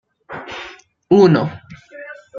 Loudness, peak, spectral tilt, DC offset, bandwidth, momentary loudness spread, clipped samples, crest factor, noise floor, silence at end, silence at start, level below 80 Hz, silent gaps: -14 LUFS; -2 dBFS; -8 dB/octave; under 0.1%; 7.2 kHz; 24 LU; under 0.1%; 18 dB; -39 dBFS; 0 s; 0.3 s; -58 dBFS; none